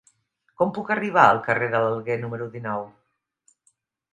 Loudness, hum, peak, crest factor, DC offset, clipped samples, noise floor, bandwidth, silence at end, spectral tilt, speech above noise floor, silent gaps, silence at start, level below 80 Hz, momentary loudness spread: -23 LUFS; none; 0 dBFS; 24 dB; under 0.1%; under 0.1%; -68 dBFS; 9.8 kHz; 1.25 s; -6.5 dB/octave; 45 dB; none; 0.6 s; -68 dBFS; 15 LU